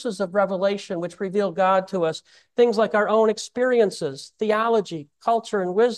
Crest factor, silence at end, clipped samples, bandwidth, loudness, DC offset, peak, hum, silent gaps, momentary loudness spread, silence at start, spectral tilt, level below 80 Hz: 16 dB; 0 s; under 0.1%; 12 kHz; -22 LUFS; under 0.1%; -6 dBFS; none; none; 10 LU; 0 s; -5 dB/octave; -72 dBFS